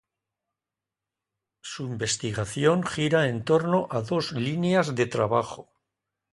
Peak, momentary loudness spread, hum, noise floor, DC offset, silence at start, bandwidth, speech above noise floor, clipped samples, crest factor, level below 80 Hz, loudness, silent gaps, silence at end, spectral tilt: -8 dBFS; 12 LU; none; -89 dBFS; under 0.1%; 1.65 s; 11.5 kHz; 64 dB; under 0.1%; 20 dB; -60 dBFS; -25 LUFS; none; 0.7 s; -5 dB/octave